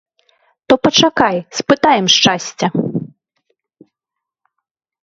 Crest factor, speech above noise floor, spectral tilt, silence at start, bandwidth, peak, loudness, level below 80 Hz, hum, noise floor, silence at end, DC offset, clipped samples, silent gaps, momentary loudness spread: 16 dB; 69 dB; -3.5 dB/octave; 0.7 s; 8 kHz; 0 dBFS; -13 LUFS; -54 dBFS; none; -82 dBFS; 1.95 s; under 0.1%; under 0.1%; none; 11 LU